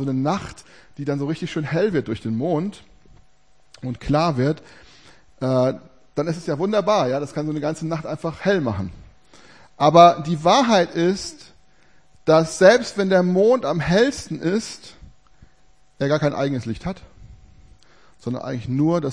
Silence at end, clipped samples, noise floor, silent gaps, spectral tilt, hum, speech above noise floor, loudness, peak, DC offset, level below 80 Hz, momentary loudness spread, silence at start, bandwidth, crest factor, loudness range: 0 s; under 0.1%; -60 dBFS; none; -6 dB/octave; none; 40 dB; -20 LUFS; 0 dBFS; 0.3%; -50 dBFS; 16 LU; 0 s; 10.5 kHz; 20 dB; 8 LU